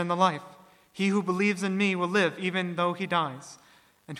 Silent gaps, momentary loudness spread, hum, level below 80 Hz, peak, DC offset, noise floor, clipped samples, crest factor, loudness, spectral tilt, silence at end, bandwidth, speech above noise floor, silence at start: none; 13 LU; none; -76 dBFS; -8 dBFS; under 0.1%; -48 dBFS; under 0.1%; 20 dB; -27 LUFS; -5.5 dB/octave; 0 s; 12.5 kHz; 21 dB; 0 s